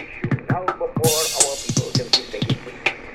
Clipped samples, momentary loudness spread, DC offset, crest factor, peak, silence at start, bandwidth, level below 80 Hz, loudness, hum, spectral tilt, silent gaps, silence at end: under 0.1%; 7 LU; under 0.1%; 22 dB; 0 dBFS; 0 s; 16.5 kHz; -46 dBFS; -21 LUFS; none; -3 dB/octave; none; 0 s